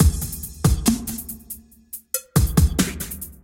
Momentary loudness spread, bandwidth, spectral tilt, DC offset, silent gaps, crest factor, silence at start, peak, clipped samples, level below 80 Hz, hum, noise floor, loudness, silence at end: 18 LU; 17 kHz; -5 dB/octave; under 0.1%; none; 20 dB; 0 s; -2 dBFS; under 0.1%; -28 dBFS; none; -41 dBFS; -22 LUFS; 0.1 s